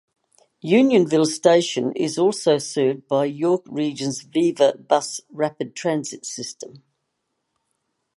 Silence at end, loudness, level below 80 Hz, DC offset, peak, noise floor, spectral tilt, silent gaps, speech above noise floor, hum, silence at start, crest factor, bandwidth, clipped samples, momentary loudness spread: 1.4 s; -21 LUFS; -74 dBFS; under 0.1%; -2 dBFS; -76 dBFS; -4.5 dB/octave; none; 55 dB; none; 0.65 s; 20 dB; 11.5 kHz; under 0.1%; 14 LU